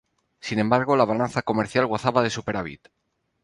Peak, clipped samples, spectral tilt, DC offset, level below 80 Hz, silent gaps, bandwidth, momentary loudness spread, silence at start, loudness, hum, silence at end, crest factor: -4 dBFS; under 0.1%; -6 dB/octave; under 0.1%; -56 dBFS; none; 11.5 kHz; 10 LU; 0.45 s; -23 LUFS; none; 0.65 s; 20 dB